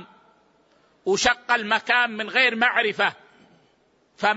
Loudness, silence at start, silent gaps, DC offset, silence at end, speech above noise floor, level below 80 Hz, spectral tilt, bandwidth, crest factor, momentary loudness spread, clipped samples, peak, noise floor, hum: -21 LUFS; 0 s; none; under 0.1%; 0 s; 41 dB; -58 dBFS; -2 dB/octave; 8 kHz; 20 dB; 7 LU; under 0.1%; -4 dBFS; -63 dBFS; none